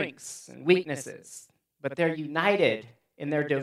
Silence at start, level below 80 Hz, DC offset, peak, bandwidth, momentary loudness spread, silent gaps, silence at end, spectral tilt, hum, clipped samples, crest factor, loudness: 0 s; -80 dBFS; under 0.1%; -8 dBFS; 13.5 kHz; 17 LU; none; 0 s; -5 dB/octave; none; under 0.1%; 22 dB; -27 LUFS